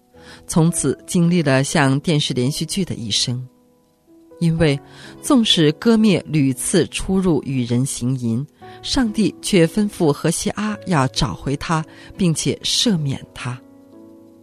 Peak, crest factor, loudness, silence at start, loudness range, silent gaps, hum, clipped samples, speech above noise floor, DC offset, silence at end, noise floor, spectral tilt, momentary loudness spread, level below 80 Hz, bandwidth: -2 dBFS; 18 dB; -18 LUFS; 0.25 s; 4 LU; none; none; under 0.1%; 38 dB; under 0.1%; 0.35 s; -56 dBFS; -5 dB/octave; 10 LU; -42 dBFS; 14 kHz